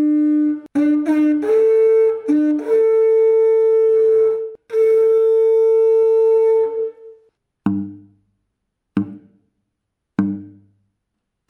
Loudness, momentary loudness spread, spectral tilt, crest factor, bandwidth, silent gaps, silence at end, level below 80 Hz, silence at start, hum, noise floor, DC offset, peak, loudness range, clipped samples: -16 LUFS; 12 LU; -9 dB/octave; 12 dB; 4.1 kHz; none; 1 s; -66 dBFS; 0 s; none; -76 dBFS; under 0.1%; -4 dBFS; 14 LU; under 0.1%